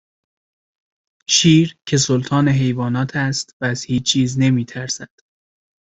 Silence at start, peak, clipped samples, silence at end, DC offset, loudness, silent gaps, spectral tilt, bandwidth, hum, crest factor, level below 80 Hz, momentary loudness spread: 1.3 s; -2 dBFS; under 0.1%; 0.8 s; under 0.1%; -17 LUFS; 3.53-3.60 s; -4.5 dB/octave; 8.4 kHz; none; 18 dB; -52 dBFS; 11 LU